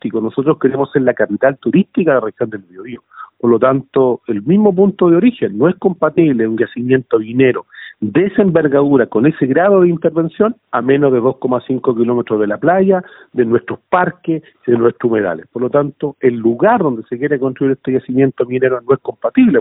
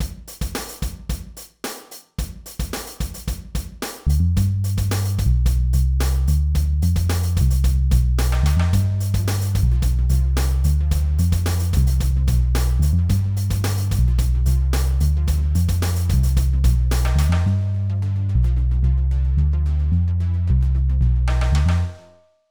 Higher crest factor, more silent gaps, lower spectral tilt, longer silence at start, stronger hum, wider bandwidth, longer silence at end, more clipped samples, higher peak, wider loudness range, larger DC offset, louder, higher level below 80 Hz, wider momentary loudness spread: about the same, 14 dB vs 12 dB; neither; first, -12.5 dB/octave vs -6 dB/octave; about the same, 0.05 s vs 0 s; neither; second, 4 kHz vs over 20 kHz; second, 0 s vs 0.5 s; neither; first, 0 dBFS vs -6 dBFS; about the same, 3 LU vs 5 LU; neither; first, -14 LUFS vs -20 LUFS; second, -56 dBFS vs -20 dBFS; second, 8 LU vs 11 LU